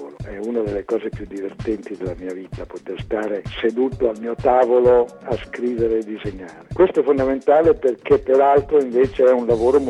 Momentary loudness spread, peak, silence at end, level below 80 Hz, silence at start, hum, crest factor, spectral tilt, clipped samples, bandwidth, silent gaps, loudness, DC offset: 16 LU; -2 dBFS; 0 s; -42 dBFS; 0 s; none; 16 dB; -7.5 dB/octave; under 0.1%; 9.8 kHz; none; -19 LUFS; under 0.1%